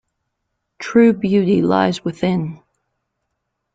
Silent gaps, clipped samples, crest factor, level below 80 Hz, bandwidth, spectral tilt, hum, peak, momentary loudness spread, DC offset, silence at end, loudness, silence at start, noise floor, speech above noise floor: none; under 0.1%; 16 dB; -56 dBFS; 7.8 kHz; -7.5 dB/octave; none; -2 dBFS; 10 LU; under 0.1%; 1.2 s; -16 LUFS; 0.8 s; -75 dBFS; 59 dB